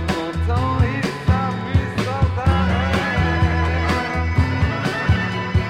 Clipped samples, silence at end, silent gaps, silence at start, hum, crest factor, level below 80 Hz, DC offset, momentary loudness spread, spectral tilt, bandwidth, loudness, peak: under 0.1%; 0 s; none; 0 s; none; 14 dB; -28 dBFS; under 0.1%; 3 LU; -6.5 dB/octave; 10.5 kHz; -20 LUFS; -4 dBFS